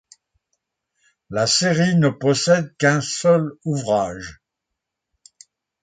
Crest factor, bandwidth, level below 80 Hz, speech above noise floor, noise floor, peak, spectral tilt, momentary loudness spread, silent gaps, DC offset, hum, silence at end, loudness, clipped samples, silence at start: 18 dB; 9.4 kHz; -56 dBFS; 63 dB; -82 dBFS; -4 dBFS; -4.5 dB/octave; 11 LU; none; under 0.1%; none; 1.5 s; -19 LUFS; under 0.1%; 1.3 s